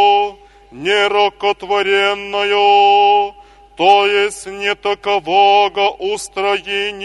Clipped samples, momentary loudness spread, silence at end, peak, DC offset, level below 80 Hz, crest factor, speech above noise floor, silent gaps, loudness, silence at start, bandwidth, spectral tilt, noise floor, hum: under 0.1%; 10 LU; 0 s; 0 dBFS; under 0.1%; -52 dBFS; 14 dB; 24 dB; none; -14 LUFS; 0 s; 11.5 kHz; -2 dB/octave; -38 dBFS; none